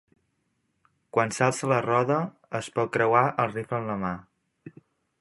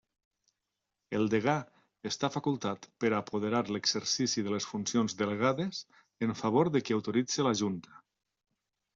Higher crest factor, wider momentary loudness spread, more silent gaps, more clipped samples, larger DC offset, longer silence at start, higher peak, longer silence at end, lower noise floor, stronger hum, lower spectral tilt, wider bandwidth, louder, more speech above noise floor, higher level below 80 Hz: about the same, 22 dB vs 18 dB; about the same, 10 LU vs 8 LU; neither; neither; neither; about the same, 1.15 s vs 1.1 s; first, -6 dBFS vs -14 dBFS; second, 0.5 s vs 1 s; second, -74 dBFS vs -87 dBFS; neither; about the same, -5.5 dB/octave vs -4.5 dB/octave; first, 11.5 kHz vs 7.8 kHz; first, -26 LUFS vs -31 LUFS; second, 49 dB vs 55 dB; first, -64 dBFS vs -72 dBFS